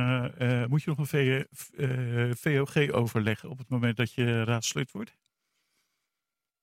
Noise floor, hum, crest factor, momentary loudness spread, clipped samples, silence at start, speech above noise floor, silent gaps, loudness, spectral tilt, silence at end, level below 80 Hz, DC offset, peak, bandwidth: -88 dBFS; none; 20 dB; 8 LU; under 0.1%; 0 s; 60 dB; none; -29 LUFS; -5.5 dB/octave; 1.55 s; -66 dBFS; under 0.1%; -10 dBFS; 16 kHz